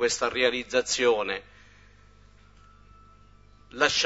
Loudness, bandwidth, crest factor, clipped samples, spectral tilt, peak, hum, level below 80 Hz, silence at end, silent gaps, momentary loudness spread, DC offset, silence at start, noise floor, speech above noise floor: -25 LUFS; 8 kHz; 22 dB; under 0.1%; -1.5 dB/octave; -8 dBFS; 50 Hz at -55 dBFS; -56 dBFS; 0 s; none; 10 LU; under 0.1%; 0 s; -55 dBFS; 30 dB